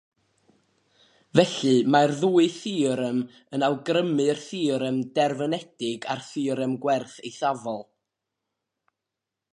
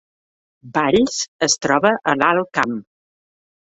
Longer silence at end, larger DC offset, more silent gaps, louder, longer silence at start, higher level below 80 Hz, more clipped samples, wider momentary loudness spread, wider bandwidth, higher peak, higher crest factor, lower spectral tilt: first, 1.7 s vs 1 s; neither; second, none vs 1.28-1.39 s; second, -25 LUFS vs -18 LUFS; first, 1.35 s vs 0.65 s; second, -70 dBFS vs -54 dBFS; neither; first, 10 LU vs 7 LU; first, 11.5 kHz vs 8.2 kHz; about the same, -4 dBFS vs -2 dBFS; about the same, 22 dB vs 18 dB; first, -5.5 dB/octave vs -3 dB/octave